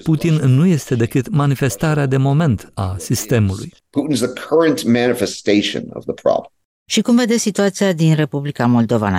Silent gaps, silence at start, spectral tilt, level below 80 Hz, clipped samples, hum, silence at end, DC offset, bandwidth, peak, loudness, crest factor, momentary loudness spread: 6.65-6.86 s; 0.05 s; -6 dB/octave; -48 dBFS; under 0.1%; none; 0 s; under 0.1%; 16 kHz; -2 dBFS; -17 LUFS; 14 dB; 7 LU